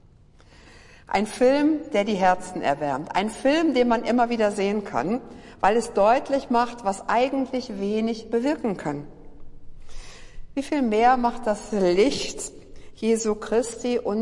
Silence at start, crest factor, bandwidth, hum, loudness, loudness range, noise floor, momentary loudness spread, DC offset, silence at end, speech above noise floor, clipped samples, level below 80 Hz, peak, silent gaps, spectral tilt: 0.75 s; 16 dB; 11.5 kHz; none; -23 LUFS; 5 LU; -52 dBFS; 9 LU; under 0.1%; 0 s; 29 dB; under 0.1%; -48 dBFS; -8 dBFS; none; -5 dB/octave